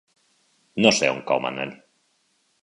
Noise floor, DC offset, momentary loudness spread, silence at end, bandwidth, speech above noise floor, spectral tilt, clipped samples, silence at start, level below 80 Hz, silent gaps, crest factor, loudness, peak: -68 dBFS; under 0.1%; 16 LU; 0.85 s; 11 kHz; 46 dB; -3 dB/octave; under 0.1%; 0.75 s; -66 dBFS; none; 24 dB; -22 LUFS; 0 dBFS